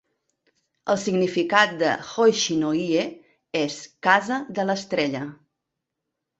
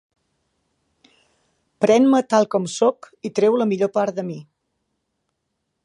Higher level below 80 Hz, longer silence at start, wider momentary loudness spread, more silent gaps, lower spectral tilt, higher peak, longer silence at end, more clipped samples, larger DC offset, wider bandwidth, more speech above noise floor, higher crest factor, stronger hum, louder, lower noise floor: first, -68 dBFS vs -74 dBFS; second, 0.85 s vs 1.8 s; second, 10 LU vs 14 LU; neither; second, -4 dB/octave vs -5.5 dB/octave; about the same, -2 dBFS vs -4 dBFS; second, 1.05 s vs 1.4 s; neither; neither; second, 8.2 kHz vs 11 kHz; about the same, 60 dB vs 57 dB; about the same, 22 dB vs 18 dB; neither; second, -23 LUFS vs -19 LUFS; first, -82 dBFS vs -76 dBFS